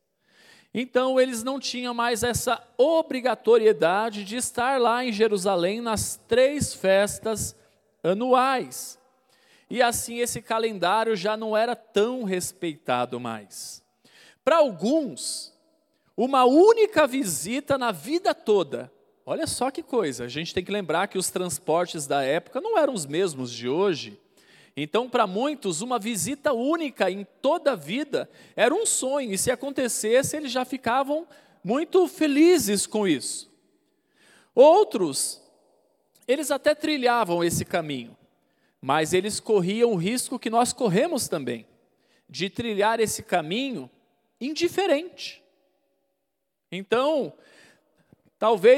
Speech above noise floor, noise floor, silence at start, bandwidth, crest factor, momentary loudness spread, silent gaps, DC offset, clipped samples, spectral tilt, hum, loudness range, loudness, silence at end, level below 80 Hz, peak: 57 dB; -80 dBFS; 0.75 s; 16.5 kHz; 20 dB; 12 LU; none; under 0.1%; under 0.1%; -3.5 dB/octave; none; 5 LU; -24 LUFS; 0 s; -62 dBFS; -4 dBFS